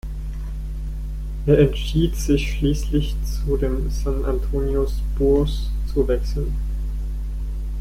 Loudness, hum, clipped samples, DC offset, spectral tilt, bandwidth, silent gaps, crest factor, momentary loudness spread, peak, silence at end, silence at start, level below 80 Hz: -23 LUFS; none; under 0.1%; under 0.1%; -7 dB/octave; 15 kHz; none; 18 dB; 12 LU; -4 dBFS; 0 s; 0.05 s; -24 dBFS